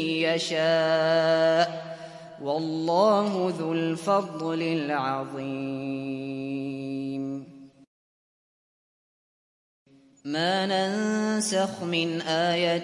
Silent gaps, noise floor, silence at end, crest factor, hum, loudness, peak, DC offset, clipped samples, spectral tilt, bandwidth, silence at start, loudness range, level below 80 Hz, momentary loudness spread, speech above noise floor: 7.87-9.86 s; under -90 dBFS; 0 s; 18 dB; none; -26 LUFS; -10 dBFS; under 0.1%; under 0.1%; -4.5 dB/octave; 11.5 kHz; 0 s; 13 LU; -76 dBFS; 11 LU; over 64 dB